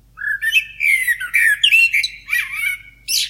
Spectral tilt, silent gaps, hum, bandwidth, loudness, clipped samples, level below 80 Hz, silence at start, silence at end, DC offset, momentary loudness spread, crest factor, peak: 4 dB/octave; none; none; 16.5 kHz; -15 LUFS; under 0.1%; -52 dBFS; 0.15 s; 0 s; under 0.1%; 11 LU; 16 dB; -2 dBFS